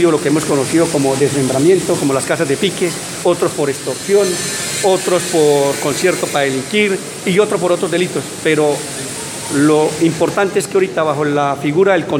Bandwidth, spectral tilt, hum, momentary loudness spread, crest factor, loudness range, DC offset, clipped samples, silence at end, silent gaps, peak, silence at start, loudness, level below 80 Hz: 17 kHz; -4 dB/octave; none; 6 LU; 14 dB; 1 LU; under 0.1%; under 0.1%; 0 s; none; 0 dBFS; 0 s; -15 LUFS; -54 dBFS